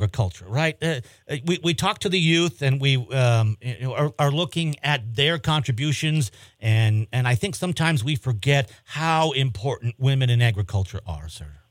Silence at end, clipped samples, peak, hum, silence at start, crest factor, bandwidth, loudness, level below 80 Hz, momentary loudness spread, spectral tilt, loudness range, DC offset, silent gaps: 0.15 s; under 0.1%; -4 dBFS; none; 0 s; 18 dB; 16 kHz; -23 LUFS; -52 dBFS; 9 LU; -5.5 dB/octave; 1 LU; under 0.1%; none